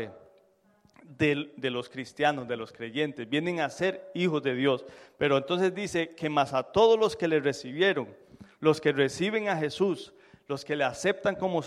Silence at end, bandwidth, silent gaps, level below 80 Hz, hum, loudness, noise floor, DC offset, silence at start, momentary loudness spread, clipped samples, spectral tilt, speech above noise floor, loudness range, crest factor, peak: 0 s; 12 kHz; none; -66 dBFS; none; -28 LUFS; -64 dBFS; under 0.1%; 0 s; 10 LU; under 0.1%; -5 dB/octave; 37 dB; 4 LU; 20 dB; -8 dBFS